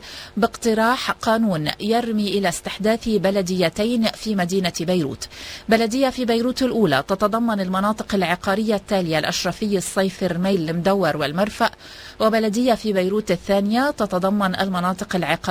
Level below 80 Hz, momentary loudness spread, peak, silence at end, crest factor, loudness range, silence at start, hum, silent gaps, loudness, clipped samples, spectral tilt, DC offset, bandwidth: -48 dBFS; 4 LU; -2 dBFS; 0 s; 18 dB; 1 LU; 0 s; none; none; -21 LUFS; under 0.1%; -5 dB/octave; under 0.1%; 16 kHz